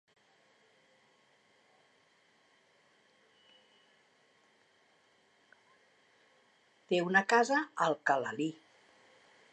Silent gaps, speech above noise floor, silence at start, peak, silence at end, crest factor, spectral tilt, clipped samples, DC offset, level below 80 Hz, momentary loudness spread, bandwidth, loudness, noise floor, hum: none; 39 dB; 6.9 s; -14 dBFS; 1 s; 24 dB; -4.5 dB/octave; under 0.1%; under 0.1%; under -90 dBFS; 11 LU; 9.8 kHz; -31 LUFS; -69 dBFS; none